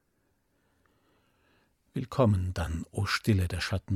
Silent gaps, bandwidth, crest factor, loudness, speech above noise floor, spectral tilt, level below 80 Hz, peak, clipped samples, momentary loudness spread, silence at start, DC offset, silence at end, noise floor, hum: none; 14.5 kHz; 20 dB; -30 LUFS; 45 dB; -6 dB/octave; -48 dBFS; -12 dBFS; under 0.1%; 9 LU; 1.95 s; under 0.1%; 0 s; -74 dBFS; none